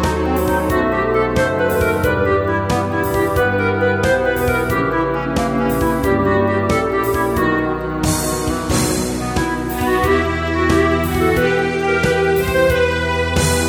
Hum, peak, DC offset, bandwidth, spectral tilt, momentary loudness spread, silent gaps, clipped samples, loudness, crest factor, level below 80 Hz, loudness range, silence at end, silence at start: none; -2 dBFS; under 0.1%; over 20 kHz; -5 dB/octave; 4 LU; none; under 0.1%; -17 LUFS; 14 dB; -30 dBFS; 2 LU; 0 s; 0 s